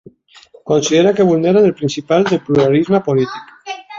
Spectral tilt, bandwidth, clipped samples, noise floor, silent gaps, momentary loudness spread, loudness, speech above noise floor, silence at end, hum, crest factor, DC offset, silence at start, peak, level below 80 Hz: -6 dB/octave; 7.6 kHz; under 0.1%; -45 dBFS; none; 16 LU; -14 LUFS; 32 dB; 0 s; none; 14 dB; under 0.1%; 0.65 s; -2 dBFS; -54 dBFS